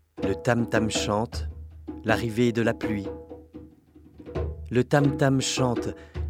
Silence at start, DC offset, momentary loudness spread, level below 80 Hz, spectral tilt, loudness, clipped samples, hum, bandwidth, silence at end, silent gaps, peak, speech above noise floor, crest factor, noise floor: 0.15 s; under 0.1%; 17 LU; -44 dBFS; -5.5 dB/octave; -26 LUFS; under 0.1%; none; 16 kHz; 0 s; none; -4 dBFS; 28 dB; 22 dB; -53 dBFS